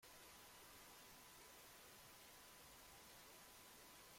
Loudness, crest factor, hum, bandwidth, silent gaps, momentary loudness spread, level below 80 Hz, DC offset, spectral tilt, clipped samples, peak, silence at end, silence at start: -62 LUFS; 12 dB; none; 16.5 kHz; none; 0 LU; -80 dBFS; under 0.1%; -1.5 dB/octave; under 0.1%; -52 dBFS; 0 s; 0 s